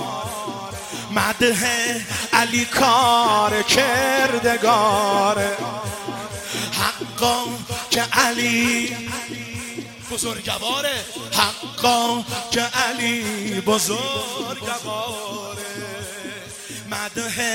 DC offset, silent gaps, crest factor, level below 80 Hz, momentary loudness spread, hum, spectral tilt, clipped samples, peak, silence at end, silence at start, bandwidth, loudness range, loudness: under 0.1%; none; 22 dB; -54 dBFS; 13 LU; none; -2.5 dB/octave; under 0.1%; 0 dBFS; 0 s; 0 s; 16.5 kHz; 7 LU; -20 LUFS